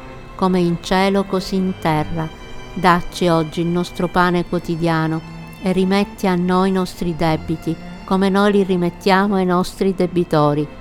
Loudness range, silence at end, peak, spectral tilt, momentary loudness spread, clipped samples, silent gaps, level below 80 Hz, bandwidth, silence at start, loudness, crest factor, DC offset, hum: 2 LU; 0 s; 0 dBFS; -6.5 dB/octave; 9 LU; under 0.1%; none; -38 dBFS; 15.5 kHz; 0 s; -18 LUFS; 18 dB; under 0.1%; none